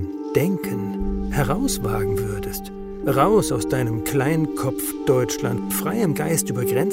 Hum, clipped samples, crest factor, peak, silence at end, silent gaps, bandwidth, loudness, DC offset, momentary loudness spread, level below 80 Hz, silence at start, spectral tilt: none; under 0.1%; 18 dB; -4 dBFS; 0 s; none; 16.5 kHz; -22 LUFS; under 0.1%; 7 LU; -36 dBFS; 0 s; -5.5 dB/octave